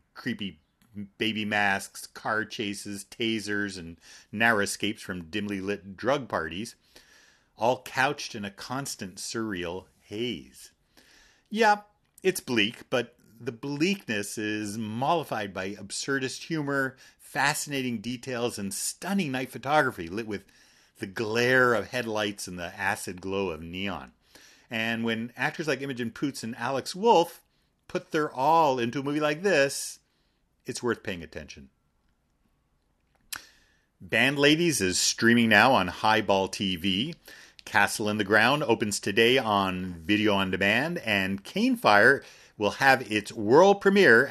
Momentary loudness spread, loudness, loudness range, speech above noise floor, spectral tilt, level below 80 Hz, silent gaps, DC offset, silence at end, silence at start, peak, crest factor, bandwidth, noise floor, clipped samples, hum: 15 LU; -26 LUFS; 8 LU; 44 dB; -4 dB/octave; -64 dBFS; none; under 0.1%; 0 s; 0.15 s; -4 dBFS; 24 dB; 13.5 kHz; -71 dBFS; under 0.1%; none